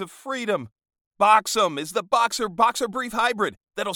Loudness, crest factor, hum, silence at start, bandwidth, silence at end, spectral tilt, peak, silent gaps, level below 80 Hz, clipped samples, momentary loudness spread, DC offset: -23 LUFS; 20 dB; none; 0 s; 19 kHz; 0 s; -2.5 dB/octave; -4 dBFS; 1.01-1.11 s; -62 dBFS; under 0.1%; 11 LU; under 0.1%